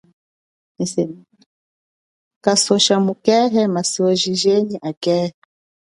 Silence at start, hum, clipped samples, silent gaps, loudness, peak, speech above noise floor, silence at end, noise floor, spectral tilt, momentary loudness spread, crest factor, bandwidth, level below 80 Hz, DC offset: 0.8 s; none; under 0.1%; 1.46-2.41 s, 4.97-5.01 s; -17 LUFS; 0 dBFS; over 73 dB; 0.65 s; under -90 dBFS; -4 dB/octave; 10 LU; 18 dB; 11.5 kHz; -64 dBFS; under 0.1%